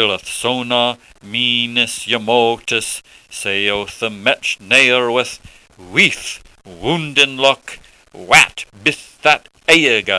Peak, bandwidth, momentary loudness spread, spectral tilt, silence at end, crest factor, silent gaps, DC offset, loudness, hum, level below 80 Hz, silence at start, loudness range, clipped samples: 0 dBFS; 11 kHz; 14 LU; -2.5 dB/octave; 0 s; 16 dB; none; under 0.1%; -14 LUFS; none; -50 dBFS; 0 s; 3 LU; 0.1%